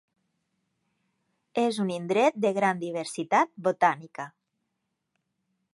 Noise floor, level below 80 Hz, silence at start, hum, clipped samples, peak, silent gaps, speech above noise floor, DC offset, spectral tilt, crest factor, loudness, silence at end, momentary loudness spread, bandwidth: -81 dBFS; -80 dBFS; 1.55 s; none; under 0.1%; -8 dBFS; none; 55 dB; under 0.1%; -5 dB/octave; 22 dB; -26 LUFS; 1.45 s; 12 LU; 11.5 kHz